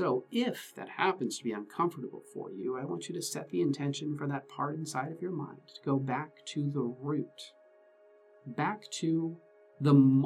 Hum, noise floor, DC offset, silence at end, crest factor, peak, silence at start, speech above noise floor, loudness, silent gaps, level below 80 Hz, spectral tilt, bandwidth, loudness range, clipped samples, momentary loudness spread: none; -61 dBFS; under 0.1%; 0 s; 20 dB; -12 dBFS; 0 s; 29 dB; -33 LUFS; none; -84 dBFS; -6 dB/octave; 14.5 kHz; 3 LU; under 0.1%; 12 LU